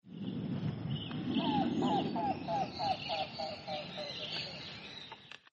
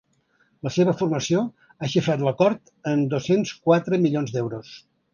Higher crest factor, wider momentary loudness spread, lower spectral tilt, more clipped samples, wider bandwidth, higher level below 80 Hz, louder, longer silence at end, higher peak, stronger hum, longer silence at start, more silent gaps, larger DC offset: about the same, 16 dB vs 20 dB; about the same, 12 LU vs 11 LU; about the same, -6.5 dB/octave vs -6.5 dB/octave; neither; about the same, 8 kHz vs 7.4 kHz; about the same, -66 dBFS vs -62 dBFS; second, -37 LUFS vs -23 LUFS; second, 0.15 s vs 0.35 s; second, -22 dBFS vs -4 dBFS; neither; second, 0.05 s vs 0.65 s; neither; neither